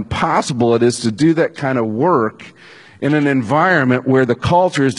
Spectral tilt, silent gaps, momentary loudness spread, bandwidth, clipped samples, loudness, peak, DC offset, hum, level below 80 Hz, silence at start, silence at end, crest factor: -6 dB/octave; none; 5 LU; 11 kHz; under 0.1%; -15 LUFS; 0 dBFS; under 0.1%; none; -46 dBFS; 0 s; 0 s; 14 dB